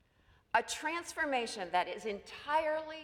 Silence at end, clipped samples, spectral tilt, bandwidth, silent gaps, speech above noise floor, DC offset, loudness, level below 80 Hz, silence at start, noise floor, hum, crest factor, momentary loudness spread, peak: 0 s; under 0.1%; -2 dB/octave; 18.5 kHz; none; 33 dB; under 0.1%; -35 LUFS; -70 dBFS; 0.55 s; -68 dBFS; none; 22 dB; 7 LU; -16 dBFS